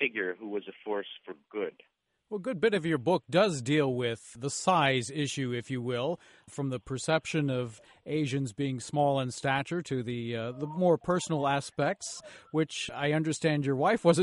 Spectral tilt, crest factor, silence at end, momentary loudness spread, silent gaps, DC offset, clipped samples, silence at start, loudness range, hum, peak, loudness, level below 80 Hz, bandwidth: -5 dB/octave; 20 dB; 0 s; 11 LU; none; under 0.1%; under 0.1%; 0 s; 4 LU; none; -10 dBFS; -30 LUFS; -66 dBFS; 11.5 kHz